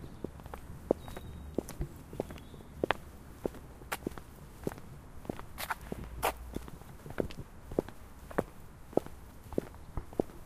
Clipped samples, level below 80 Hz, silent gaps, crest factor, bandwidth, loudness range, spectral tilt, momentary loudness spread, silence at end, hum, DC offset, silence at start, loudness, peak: under 0.1%; -50 dBFS; none; 34 dB; 15.5 kHz; 2 LU; -5.5 dB/octave; 14 LU; 0 s; none; under 0.1%; 0 s; -40 LUFS; -6 dBFS